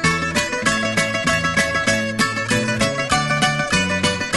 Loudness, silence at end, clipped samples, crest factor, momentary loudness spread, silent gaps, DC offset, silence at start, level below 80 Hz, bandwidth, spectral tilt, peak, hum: -18 LUFS; 0 s; under 0.1%; 16 dB; 2 LU; none; 0.2%; 0 s; -42 dBFS; 12 kHz; -3.5 dB/octave; -2 dBFS; none